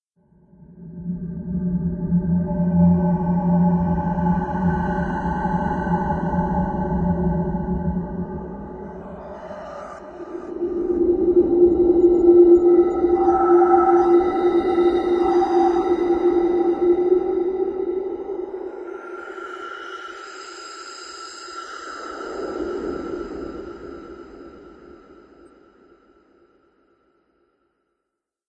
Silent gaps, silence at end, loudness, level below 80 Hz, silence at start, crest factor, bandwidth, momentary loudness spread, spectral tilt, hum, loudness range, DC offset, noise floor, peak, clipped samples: none; 3.55 s; -19 LUFS; -40 dBFS; 0.7 s; 18 dB; 8 kHz; 20 LU; -9 dB/octave; none; 17 LU; under 0.1%; -81 dBFS; -4 dBFS; under 0.1%